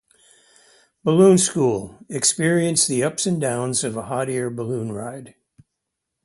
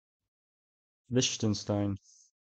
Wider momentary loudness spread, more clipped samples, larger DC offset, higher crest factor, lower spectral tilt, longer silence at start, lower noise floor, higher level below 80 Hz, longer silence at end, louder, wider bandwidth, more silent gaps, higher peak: first, 15 LU vs 7 LU; neither; neither; about the same, 20 dB vs 18 dB; about the same, -4.5 dB/octave vs -4.5 dB/octave; about the same, 1.05 s vs 1.1 s; second, -80 dBFS vs under -90 dBFS; first, -60 dBFS vs -66 dBFS; first, 0.95 s vs 0.65 s; first, -20 LUFS vs -31 LUFS; first, 11.5 kHz vs 8.6 kHz; neither; first, -2 dBFS vs -16 dBFS